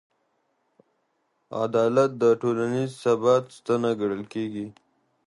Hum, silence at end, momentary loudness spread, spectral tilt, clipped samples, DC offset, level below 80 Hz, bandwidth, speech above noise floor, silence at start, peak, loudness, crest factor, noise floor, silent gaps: none; 0.55 s; 11 LU; -6.5 dB/octave; under 0.1%; under 0.1%; -70 dBFS; 11.5 kHz; 49 dB; 1.5 s; -8 dBFS; -24 LUFS; 18 dB; -73 dBFS; none